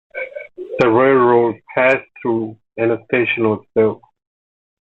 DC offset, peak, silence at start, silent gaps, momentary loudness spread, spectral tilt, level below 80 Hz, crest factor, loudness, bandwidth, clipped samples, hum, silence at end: under 0.1%; -2 dBFS; 0.15 s; none; 16 LU; -8 dB/octave; -58 dBFS; 16 dB; -16 LUFS; 7.6 kHz; under 0.1%; none; 1 s